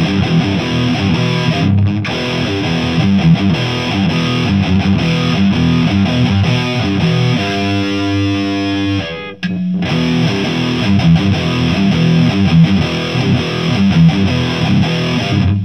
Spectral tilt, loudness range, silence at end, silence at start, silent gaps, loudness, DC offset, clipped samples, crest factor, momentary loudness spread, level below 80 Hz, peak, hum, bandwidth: -6.5 dB/octave; 3 LU; 0 s; 0 s; none; -13 LUFS; 0.5%; under 0.1%; 12 dB; 5 LU; -36 dBFS; 0 dBFS; none; 9.2 kHz